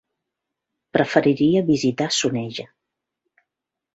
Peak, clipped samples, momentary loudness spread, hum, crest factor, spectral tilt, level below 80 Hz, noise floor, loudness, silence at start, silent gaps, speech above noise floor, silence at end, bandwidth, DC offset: -2 dBFS; under 0.1%; 10 LU; none; 20 dB; -5 dB/octave; -62 dBFS; -84 dBFS; -20 LUFS; 0.95 s; none; 64 dB; 1.3 s; 8 kHz; under 0.1%